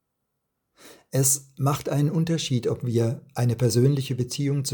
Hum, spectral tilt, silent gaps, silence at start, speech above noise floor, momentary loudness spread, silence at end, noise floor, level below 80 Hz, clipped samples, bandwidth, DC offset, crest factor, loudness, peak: none; -5.5 dB/octave; none; 0.85 s; 55 dB; 6 LU; 0 s; -78 dBFS; -60 dBFS; under 0.1%; 19 kHz; under 0.1%; 18 dB; -24 LUFS; -8 dBFS